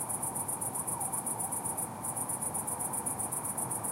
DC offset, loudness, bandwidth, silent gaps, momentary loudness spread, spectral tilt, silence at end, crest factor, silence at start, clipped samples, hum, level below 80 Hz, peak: under 0.1%; -33 LUFS; 16 kHz; none; 1 LU; -3.5 dB/octave; 0 s; 16 dB; 0 s; under 0.1%; none; -66 dBFS; -20 dBFS